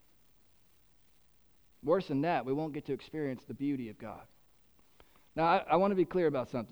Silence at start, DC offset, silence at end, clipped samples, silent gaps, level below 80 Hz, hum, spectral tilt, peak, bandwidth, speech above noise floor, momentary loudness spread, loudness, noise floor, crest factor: 1.85 s; under 0.1%; 0.05 s; under 0.1%; none; -66 dBFS; none; -8 dB/octave; -14 dBFS; over 20 kHz; 36 dB; 16 LU; -33 LUFS; -69 dBFS; 20 dB